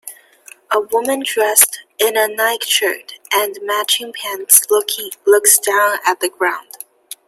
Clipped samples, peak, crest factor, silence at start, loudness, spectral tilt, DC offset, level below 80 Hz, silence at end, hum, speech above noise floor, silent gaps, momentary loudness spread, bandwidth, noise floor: under 0.1%; 0 dBFS; 16 dB; 0.05 s; -14 LUFS; 1.5 dB/octave; under 0.1%; -70 dBFS; 0.15 s; none; 28 dB; none; 14 LU; 16.5 kHz; -44 dBFS